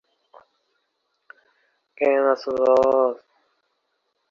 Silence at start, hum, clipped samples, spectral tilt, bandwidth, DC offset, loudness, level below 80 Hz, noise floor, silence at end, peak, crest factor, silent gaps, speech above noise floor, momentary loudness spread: 2 s; none; under 0.1%; -5.5 dB/octave; 7.2 kHz; under 0.1%; -20 LUFS; -66 dBFS; -74 dBFS; 1.15 s; -6 dBFS; 18 dB; none; 55 dB; 7 LU